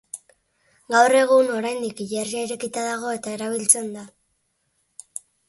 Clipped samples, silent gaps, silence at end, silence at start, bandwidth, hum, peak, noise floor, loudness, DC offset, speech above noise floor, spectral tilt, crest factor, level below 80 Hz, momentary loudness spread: under 0.1%; none; 1.4 s; 0.15 s; 12 kHz; none; -2 dBFS; -71 dBFS; -21 LUFS; under 0.1%; 50 dB; -2 dB/octave; 22 dB; -72 dBFS; 21 LU